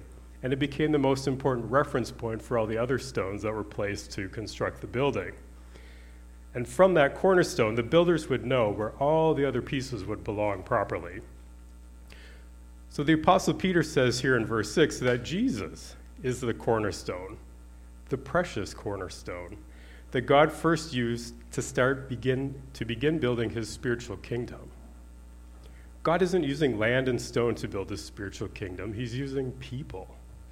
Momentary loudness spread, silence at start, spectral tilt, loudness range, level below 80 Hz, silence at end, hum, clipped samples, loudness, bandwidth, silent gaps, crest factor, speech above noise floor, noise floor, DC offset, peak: 15 LU; 0 s; -5.5 dB/octave; 8 LU; -48 dBFS; 0 s; 60 Hz at -50 dBFS; under 0.1%; -28 LUFS; 16 kHz; none; 22 dB; 20 dB; -48 dBFS; under 0.1%; -6 dBFS